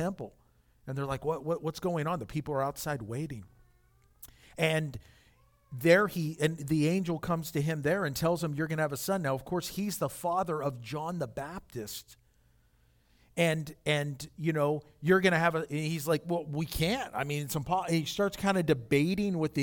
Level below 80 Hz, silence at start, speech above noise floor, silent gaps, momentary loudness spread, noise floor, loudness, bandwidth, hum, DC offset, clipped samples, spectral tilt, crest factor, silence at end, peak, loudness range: -56 dBFS; 0 s; 36 dB; none; 13 LU; -66 dBFS; -31 LUFS; 18.5 kHz; none; under 0.1%; under 0.1%; -5.5 dB/octave; 22 dB; 0 s; -10 dBFS; 6 LU